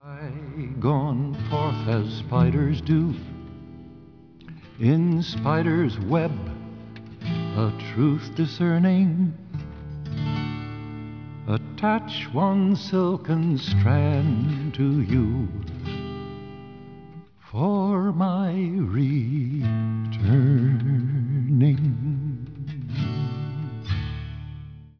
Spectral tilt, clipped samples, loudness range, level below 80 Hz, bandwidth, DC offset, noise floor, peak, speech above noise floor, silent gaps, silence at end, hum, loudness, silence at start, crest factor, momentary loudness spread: -9 dB/octave; under 0.1%; 5 LU; -46 dBFS; 5.4 kHz; 0.1%; -47 dBFS; -8 dBFS; 26 dB; none; 0.15 s; none; -24 LUFS; 0 s; 16 dB; 17 LU